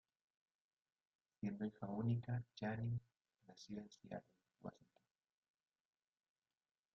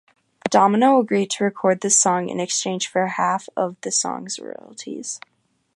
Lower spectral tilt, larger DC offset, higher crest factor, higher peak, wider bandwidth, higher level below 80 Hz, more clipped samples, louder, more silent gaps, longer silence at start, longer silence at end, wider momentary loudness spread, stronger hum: first, -7.5 dB/octave vs -3 dB/octave; neither; about the same, 20 dB vs 18 dB; second, -30 dBFS vs -2 dBFS; second, 7 kHz vs 11.5 kHz; about the same, -78 dBFS vs -74 dBFS; neither; second, -48 LUFS vs -20 LUFS; neither; first, 1.4 s vs 0.45 s; first, 2.25 s vs 0.6 s; about the same, 15 LU vs 15 LU; neither